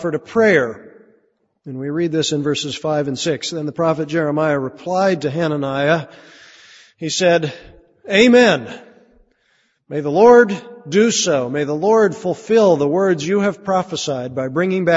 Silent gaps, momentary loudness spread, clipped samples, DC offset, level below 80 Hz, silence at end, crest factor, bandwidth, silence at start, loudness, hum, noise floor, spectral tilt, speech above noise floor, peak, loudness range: none; 13 LU; under 0.1%; under 0.1%; -58 dBFS; 0 s; 18 dB; 8 kHz; 0 s; -17 LUFS; none; -63 dBFS; -4.5 dB/octave; 46 dB; 0 dBFS; 5 LU